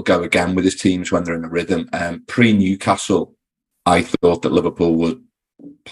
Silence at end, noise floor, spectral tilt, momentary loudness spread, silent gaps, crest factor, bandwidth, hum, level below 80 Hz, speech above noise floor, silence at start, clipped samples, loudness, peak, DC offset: 0 s; -73 dBFS; -5.5 dB/octave; 8 LU; none; 18 dB; 12 kHz; none; -48 dBFS; 56 dB; 0 s; under 0.1%; -18 LUFS; 0 dBFS; under 0.1%